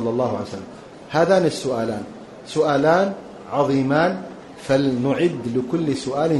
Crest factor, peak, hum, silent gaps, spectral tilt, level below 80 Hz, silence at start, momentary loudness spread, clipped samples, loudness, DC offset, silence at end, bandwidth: 16 dB; -4 dBFS; none; none; -6.5 dB/octave; -56 dBFS; 0 s; 18 LU; under 0.1%; -21 LUFS; under 0.1%; 0 s; 11.5 kHz